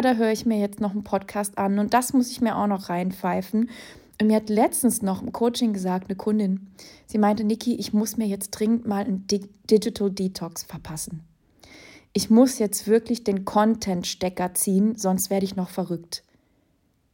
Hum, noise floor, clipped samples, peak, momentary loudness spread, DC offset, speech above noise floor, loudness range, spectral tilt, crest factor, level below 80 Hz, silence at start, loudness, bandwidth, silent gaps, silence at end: none; -66 dBFS; under 0.1%; -6 dBFS; 9 LU; under 0.1%; 43 dB; 3 LU; -5 dB/octave; 18 dB; -58 dBFS; 0 s; -24 LUFS; 17 kHz; none; 0.95 s